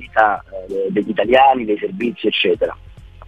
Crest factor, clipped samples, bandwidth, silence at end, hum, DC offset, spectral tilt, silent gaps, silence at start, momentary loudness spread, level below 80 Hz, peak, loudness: 18 dB; under 0.1%; 7.4 kHz; 0 s; none; 0.2%; -6.5 dB/octave; none; 0 s; 11 LU; -46 dBFS; 0 dBFS; -17 LUFS